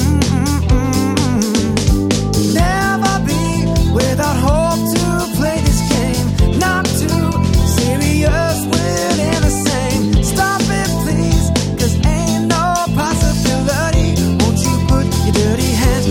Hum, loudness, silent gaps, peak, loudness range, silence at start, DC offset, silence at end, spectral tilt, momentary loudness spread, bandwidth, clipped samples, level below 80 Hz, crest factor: none; -15 LUFS; none; 0 dBFS; 0 LU; 0 s; under 0.1%; 0 s; -5 dB/octave; 2 LU; 17 kHz; under 0.1%; -22 dBFS; 14 dB